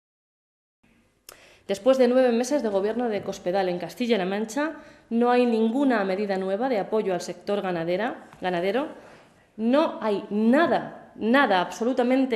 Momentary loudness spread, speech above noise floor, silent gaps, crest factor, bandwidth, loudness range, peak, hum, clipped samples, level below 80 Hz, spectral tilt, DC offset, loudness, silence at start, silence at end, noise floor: 10 LU; 29 dB; none; 16 dB; 13.5 kHz; 3 LU; -8 dBFS; none; under 0.1%; -68 dBFS; -5.5 dB/octave; under 0.1%; -24 LUFS; 1.7 s; 0 s; -52 dBFS